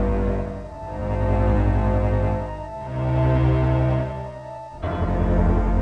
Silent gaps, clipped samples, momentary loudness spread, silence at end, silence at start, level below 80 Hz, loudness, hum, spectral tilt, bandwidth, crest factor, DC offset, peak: none; under 0.1%; 13 LU; 0 s; 0 s; -26 dBFS; -23 LUFS; none; -9.5 dB/octave; 6 kHz; 12 dB; under 0.1%; -8 dBFS